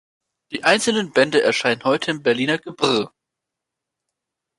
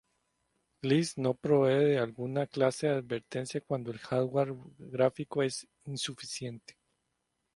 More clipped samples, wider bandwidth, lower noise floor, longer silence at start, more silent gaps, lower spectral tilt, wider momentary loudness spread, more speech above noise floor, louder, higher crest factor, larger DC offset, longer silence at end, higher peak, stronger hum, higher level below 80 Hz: neither; about the same, 11.5 kHz vs 11.5 kHz; about the same, -83 dBFS vs -81 dBFS; second, 0.5 s vs 0.85 s; neither; second, -3.5 dB/octave vs -5.5 dB/octave; second, 6 LU vs 13 LU; first, 64 dB vs 50 dB; first, -19 LUFS vs -31 LUFS; about the same, 20 dB vs 20 dB; neither; first, 1.5 s vs 1 s; first, -2 dBFS vs -12 dBFS; neither; first, -64 dBFS vs -72 dBFS